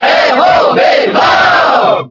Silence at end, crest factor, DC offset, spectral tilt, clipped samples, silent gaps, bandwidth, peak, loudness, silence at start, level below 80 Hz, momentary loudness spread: 0.05 s; 8 dB; under 0.1%; -4 dB/octave; 0.2%; none; 6 kHz; 0 dBFS; -7 LUFS; 0 s; -48 dBFS; 2 LU